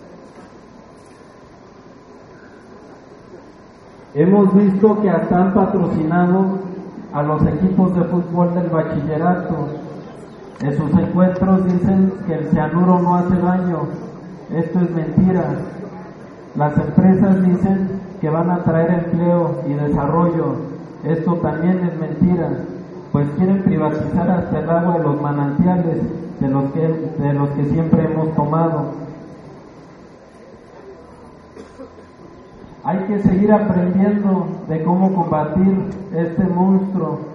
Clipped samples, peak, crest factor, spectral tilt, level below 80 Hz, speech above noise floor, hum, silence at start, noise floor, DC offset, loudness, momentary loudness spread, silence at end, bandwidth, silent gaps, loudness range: under 0.1%; 0 dBFS; 18 dB; -11 dB/octave; -44 dBFS; 26 dB; none; 0 s; -42 dBFS; under 0.1%; -17 LUFS; 13 LU; 0 s; 4.9 kHz; none; 4 LU